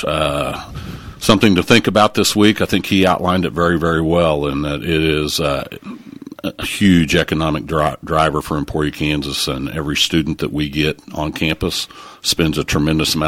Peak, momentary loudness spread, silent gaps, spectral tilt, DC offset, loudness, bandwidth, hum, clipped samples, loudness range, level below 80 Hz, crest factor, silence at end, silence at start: 0 dBFS; 11 LU; none; -4.5 dB/octave; under 0.1%; -16 LUFS; 17 kHz; none; under 0.1%; 4 LU; -36 dBFS; 16 dB; 0 s; 0 s